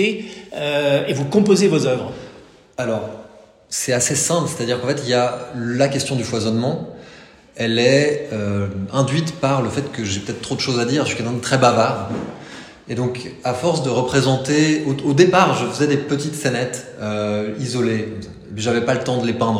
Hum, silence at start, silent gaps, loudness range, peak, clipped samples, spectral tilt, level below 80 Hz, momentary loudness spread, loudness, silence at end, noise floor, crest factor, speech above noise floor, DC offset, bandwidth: none; 0 s; none; 4 LU; 0 dBFS; under 0.1%; -5 dB/octave; -54 dBFS; 13 LU; -19 LUFS; 0 s; -44 dBFS; 20 dB; 26 dB; under 0.1%; 16 kHz